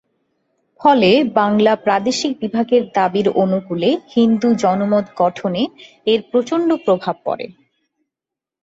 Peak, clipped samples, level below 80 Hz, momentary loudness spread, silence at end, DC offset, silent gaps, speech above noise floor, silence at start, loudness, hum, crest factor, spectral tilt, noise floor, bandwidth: -2 dBFS; under 0.1%; -60 dBFS; 9 LU; 1.15 s; under 0.1%; none; 70 dB; 0.8 s; -17 LUFS; none; 16 dB; -5.5 dB/octave; -86 dBFS; 8 kHz